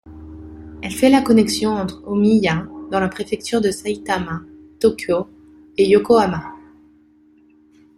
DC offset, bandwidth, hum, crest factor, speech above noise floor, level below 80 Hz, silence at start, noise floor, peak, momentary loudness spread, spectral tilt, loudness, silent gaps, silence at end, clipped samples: under 0.1%; 15.5 kHz; none; 18 dB; 35 dB; -48 dBFS; 0.05 s; -52 dBFS; -2 dBFS; 21 LU; -5.5 dB/octave; -18 LUFS; none; 1.4 s; under 0.1%